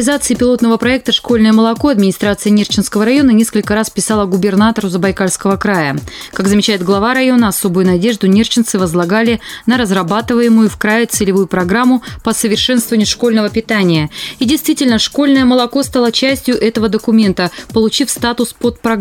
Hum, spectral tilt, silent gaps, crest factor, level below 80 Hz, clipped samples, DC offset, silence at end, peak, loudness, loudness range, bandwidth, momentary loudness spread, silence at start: none; -4.5 dB/octave; none; 12 dB; -38 dBFS; under 0.1%; under 0.1%; 0 s; 0 dBFS; -12 LUFS; 2 LU; 17 kHz; 5 LU; 0 s